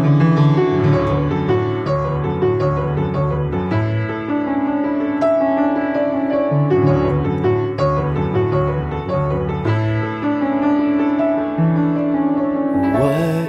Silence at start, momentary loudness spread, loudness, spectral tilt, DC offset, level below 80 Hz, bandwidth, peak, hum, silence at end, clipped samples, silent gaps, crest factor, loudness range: 0 s; 5 LU; -18 LUFS; -9.5 dB/octave; under 0.1%; -36 dBFS; 6.8 kHz; -4 dBFS; none; 0 s; under 0.1%; none; 14 dB; 2 LU